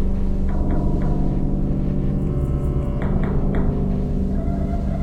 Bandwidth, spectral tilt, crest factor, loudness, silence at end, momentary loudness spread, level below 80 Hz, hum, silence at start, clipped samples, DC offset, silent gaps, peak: 4.2 kHz; -10.5 dB/octave; 12 dB; -23 LUFS; 0 s; 2 LU; -22 dBFS; none; 0 s; under 0.1%; under 0.1%; none; -8 dBFS